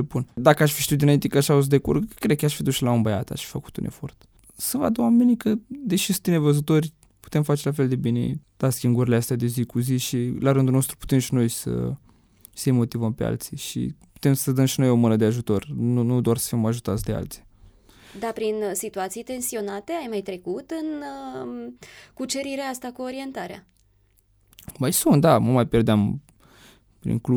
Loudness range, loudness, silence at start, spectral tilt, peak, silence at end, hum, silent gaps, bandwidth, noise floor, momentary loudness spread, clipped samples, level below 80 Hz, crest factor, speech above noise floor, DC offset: 9 LU; -23 LUFS; 0 s; -6 dB/octave; -2 dBFS; 0 s; none; none; over 20 kHz; -62 dBFS; 14 LU; under 0.1%; -50 dBFS; 20 dB; 39 dB; under 0.1%